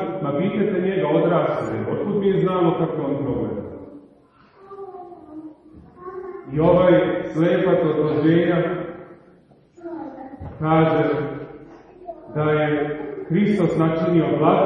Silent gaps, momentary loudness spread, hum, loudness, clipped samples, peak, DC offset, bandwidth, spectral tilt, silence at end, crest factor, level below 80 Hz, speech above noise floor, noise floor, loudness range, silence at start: none; 21 LU; none; -20 LUFS; under 0.1%; -2 dBFS; under 0.1%; 7.2 kHz; -9 dB/octave; 0 s; 18 dB; -52 dBFS; 34 dB; -53 dBFS; 7 LU; 0 s